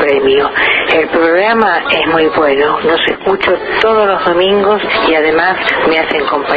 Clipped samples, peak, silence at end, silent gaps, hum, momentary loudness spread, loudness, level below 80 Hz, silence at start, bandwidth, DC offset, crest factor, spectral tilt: under 0.1%; 0 dBFS; 0 s; none; none; 2 LU; -10 LUFS; -42 dBFS; 0 s; 7 kHz; under 0.1%; 10 dB; -6 dB/octave